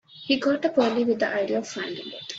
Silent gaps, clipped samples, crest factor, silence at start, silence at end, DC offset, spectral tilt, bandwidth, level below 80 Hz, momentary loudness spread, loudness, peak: none; under 0.1%; 16 dB; 0.1 s; 0 s; under 0.1%; -4 dB/octave; 8 kHz; -70 dBFS; 10 LU; -25 LUFS; -8 dBFS